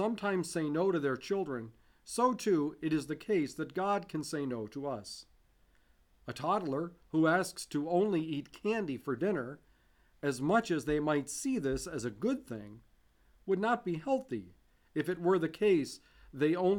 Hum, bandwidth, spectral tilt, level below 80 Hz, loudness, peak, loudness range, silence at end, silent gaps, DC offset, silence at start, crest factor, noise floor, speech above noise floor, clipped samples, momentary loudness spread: none; 18 kHz; -5.5 dB/octave; -62 dBFS; -34 LUFS; -16 dBFS; 4 LU; 0 s; none; under 0.1%; 0 s; 18 dB; -67 dBFS; 34 dB; under 0.1%; 13 LU